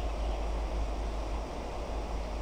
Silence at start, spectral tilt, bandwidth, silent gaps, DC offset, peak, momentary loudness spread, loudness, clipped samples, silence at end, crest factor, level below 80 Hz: 0 s; -6 dB/octave; 9.6 kHz; none; under 0.1%; -24 dBFS; 3 LU; -37 LUFS; under 0.1%; 0 s; 10 dB; -34 dBFS